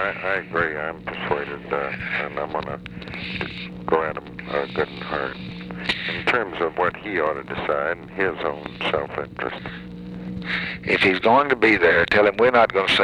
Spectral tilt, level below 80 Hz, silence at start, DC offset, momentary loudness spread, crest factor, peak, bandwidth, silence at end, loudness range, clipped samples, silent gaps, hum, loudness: -5.5 dB/octave; -48 dBFS; 0 s; under 0.1%; 15 LU; 18 dB; -4 dBFS; 11.5 kHz; 0 s; 8 LU; under 0.1%; none; none; -22 LUFS